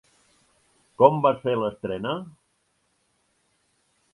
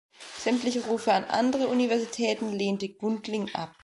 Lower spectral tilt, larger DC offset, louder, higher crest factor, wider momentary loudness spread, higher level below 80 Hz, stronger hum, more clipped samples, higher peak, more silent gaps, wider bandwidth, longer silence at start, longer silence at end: first, -8 dB/octave vs -4.5 dB/octave; neither; first, -23 LUFS vs -28 LUFS; first, 26 dB vs 18 dB; first, 14 LU vs 7 LU; first, -64 dBFS vs -70 dBFS; neither; neither; first, 0 dBFS vs -10 dBFS; neither; about the same, 11 kHz vs 11.5 kHz; first, 1 s vs 0.2 s; first, 1.85 s vs 0.15 s